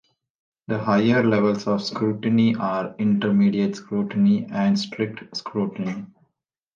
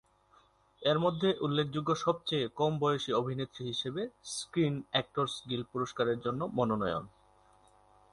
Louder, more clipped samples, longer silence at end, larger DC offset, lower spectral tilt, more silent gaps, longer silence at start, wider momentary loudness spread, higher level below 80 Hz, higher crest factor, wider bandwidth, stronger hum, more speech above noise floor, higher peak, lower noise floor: first, -22 LUFS vs -33 LUFS; neither; second, 0.7 s vs 1.05 s; neither; first, -7 dB/octave vs -5.5 dB/octave; neither; about the same, 0.7 s vs 0.8 s; about the same, 10 LU vs 8 LU; about the same, -64 dBFS vs -66 dBFS; second, 14 dB vs 20 dB; second, 7.2 kHz vs 11.5 kHz; second, none vs 50 Hz at -60 dBFS; first, 56 dB vs 33 dB; first, -8 dBFS vs -14 dBFS; first, -77 dBFS vs -66 dBFS